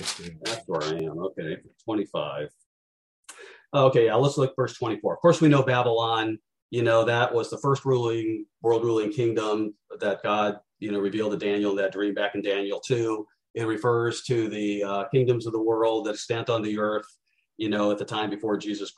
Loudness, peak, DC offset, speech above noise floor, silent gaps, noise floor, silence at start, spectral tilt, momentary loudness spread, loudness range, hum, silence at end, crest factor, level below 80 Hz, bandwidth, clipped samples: -26 LUFS; -6 dBFS; under 0.1%; over 65 dB; 2.66-3.23 s, 6.62-6.69 s, 13.50-13.54 s; under -90 dBFS; 0 s; -6 dB/octave; 11 LU; 5 LU; none; 0.05 s; 18 dB; -68 dBFS; 12 kHz; under 0.1%